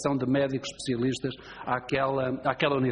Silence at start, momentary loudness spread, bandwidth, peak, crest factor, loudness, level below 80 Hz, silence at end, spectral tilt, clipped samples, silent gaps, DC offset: 0 s; 7 LU; 9.6 kHz; -10 dBFS; 18 dB; -28 LUFS; -58 dBFS; 0 s; -5.5 dB/octave; under 0.1%; none; under 0.1%